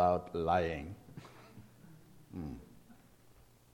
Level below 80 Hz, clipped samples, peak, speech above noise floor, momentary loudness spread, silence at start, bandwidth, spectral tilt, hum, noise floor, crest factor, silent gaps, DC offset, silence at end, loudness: -58 dBFS; under 0.1%; -16 dBFS; 28 dB; 26 LU; 0 s; 17 kHz; -7 dB/octave; none; -62 dBFS; 22 dB; none; under 0.1%; 0.8 s; -36 LUFS